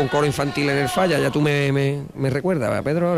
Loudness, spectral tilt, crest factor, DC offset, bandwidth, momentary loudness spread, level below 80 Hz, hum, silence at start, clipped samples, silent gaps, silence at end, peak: -21 LUFS; -6 dB/octave; 12 dB; under 0.1%; 15 kHz; 4 LU; -48 dBFS; none; 0 s; under 0.1%; none; 0 s; -8 dBFS